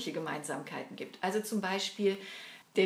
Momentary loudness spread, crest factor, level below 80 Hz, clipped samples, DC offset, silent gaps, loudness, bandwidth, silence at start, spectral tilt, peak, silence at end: 11 LU; 20 dB; -88 dBFS; under 0.1%; under 0.1%; none; -35 LUFS; 16 kHz; 0 s; -4 dB/octave; -16 dBFS; 0 s